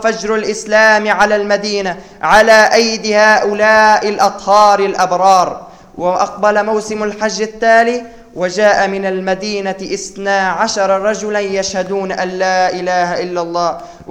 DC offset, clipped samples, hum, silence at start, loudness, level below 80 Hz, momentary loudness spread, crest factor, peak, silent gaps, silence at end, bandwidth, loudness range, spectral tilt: 0.3%; under 0.1%; none; 0 s; -12 LUFS; -46 dBFS; 11 LU; 12 dB; 0 dBFS; none; 0.1 s; 15 kHz; 6 LU; -3 dB/octave